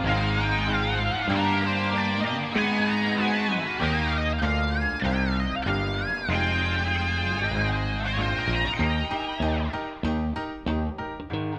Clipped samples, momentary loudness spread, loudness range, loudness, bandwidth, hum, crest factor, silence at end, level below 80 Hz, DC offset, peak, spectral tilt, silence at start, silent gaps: under 0.1%; 5 LU; 3 LU; -26 LUFS; 9 kHz; none; 14 dB; 0 s; -36 dBFS; under 0.1%; -12 dBFS; -6.5 dB/octave; 0 s; none